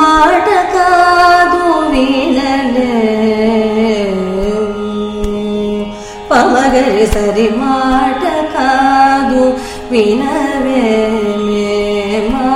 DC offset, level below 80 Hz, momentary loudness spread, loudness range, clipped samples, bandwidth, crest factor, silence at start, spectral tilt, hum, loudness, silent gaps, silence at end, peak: under 0.1%; -30 dBFS; 8 LU; 4 LU; under 0.1%; 15.5 kHz; 10 dB; 0 s; -5 dB/octave; none; -11 LUFS; none; 0 s; 0 dBFS